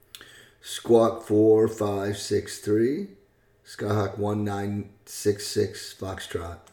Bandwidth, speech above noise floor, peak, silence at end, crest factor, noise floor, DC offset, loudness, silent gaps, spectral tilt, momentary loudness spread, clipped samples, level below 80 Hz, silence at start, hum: 19 kHz; 33 dB; -8 dBFS; 0.15 s; 18 dB; -58 dBFS; under 0.1%; -26 LUFS; none; -6 dB/octave; 16 LU; under 0.1%; -58 dBFS; 0.15 s; none